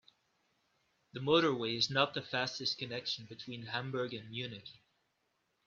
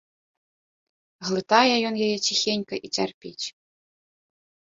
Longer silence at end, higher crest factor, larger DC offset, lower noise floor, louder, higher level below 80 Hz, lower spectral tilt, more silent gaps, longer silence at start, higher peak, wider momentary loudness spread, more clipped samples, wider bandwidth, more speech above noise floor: second, 0.95 s vs 1.15 s; about the same, 24 dB vs 24 dB; neither; second, -80 dBFS vs under -90 dBFS; second, -35 LUFS vs -23 LUFS; second, -76 dBFS vs -70 dBFS; first, -4.5 dB/octave vs -3 dB/octave; second, none vs 3.14-3.21 s; about the same, 1.15 s vs 1.2 s; second, -14 dBFS vs -2 dBFS; about the same, 16 LU vs 15 LU; neither; about the same, 7.6 kHz vs 7.8 kHz; second, 44 dB vs over 66 dB